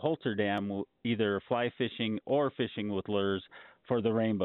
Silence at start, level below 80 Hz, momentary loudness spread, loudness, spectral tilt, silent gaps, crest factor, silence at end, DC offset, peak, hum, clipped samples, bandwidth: 0 s; -70 dBFS; 6 LU; -32 LUFS; -4.5 dB/octave; none; 16 dB; 0 s; under 0.1%; -16 dBFS; none; under 0.1%; 4.2 kHz